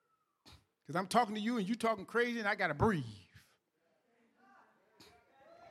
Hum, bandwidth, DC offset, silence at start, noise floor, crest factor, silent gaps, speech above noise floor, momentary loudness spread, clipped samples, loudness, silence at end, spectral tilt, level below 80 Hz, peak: none; 14.5 kHz; under 0.1%; 0.45 s; -78 dBFS; 24 dB; none; 44 dB; 8 LU; under 0.1%; -35 LUFS; 0 s; -5.5 dB/octave; -62 dBFS; -14 dBFS